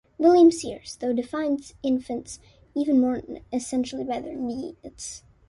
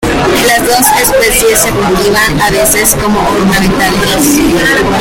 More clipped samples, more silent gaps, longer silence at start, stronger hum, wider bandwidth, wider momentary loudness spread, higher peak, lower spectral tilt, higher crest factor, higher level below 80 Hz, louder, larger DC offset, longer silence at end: second, under 0.1% vs 0.3%; neither; first, 0.2 s vs 0 s; neither; second, 11.5 kHz vs over 20 kHz; first, 19 LU vs 3 LU; second, -6 dBFS vs 0 dBFS; first, -4.5 dB/octave vs -3 dB/octave; first, 18 dB vs 8 dB; second, -56 dBFS vs -24 dBFS; second, -24 LUFS vs -7 LUFS; neither; first, 0.3 s vs 0 s